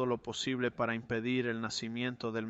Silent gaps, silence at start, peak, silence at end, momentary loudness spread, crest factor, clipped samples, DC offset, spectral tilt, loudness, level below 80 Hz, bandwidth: none; 0 s; -20 dBFS; 0 s; 3 LU; 16 dB; under 0.1%; under 0.1%; -4.5 dB/octave; -35 LUFS; -66 dBFS; 8.2 kHz